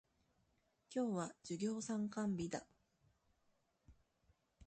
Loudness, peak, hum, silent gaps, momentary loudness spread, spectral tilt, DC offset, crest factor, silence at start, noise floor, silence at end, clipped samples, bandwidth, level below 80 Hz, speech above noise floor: -43 LUFS; -30 dBFS; none; none; 6 LU; -5.5 dB/octave; under 0.1%; 18 dB; 0.9 s; -80 dBFS; 0.05 s; under 0.1%; 9 kHz; -74 dBFS; 38 dB